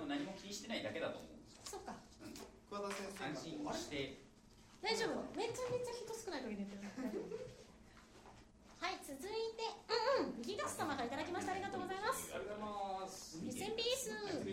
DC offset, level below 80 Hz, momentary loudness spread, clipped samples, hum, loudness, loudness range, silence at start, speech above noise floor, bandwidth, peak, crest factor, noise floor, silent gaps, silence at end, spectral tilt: under 0.1%; -70 dBFS; 16 LU; under 0.1%; none; -43 LUFS; 6 LU; 0 s; 20 dB; 16 kHz; -24 dBFS; 20 dB; -64 dBFS; none; 0 s; -3.5 dB/octave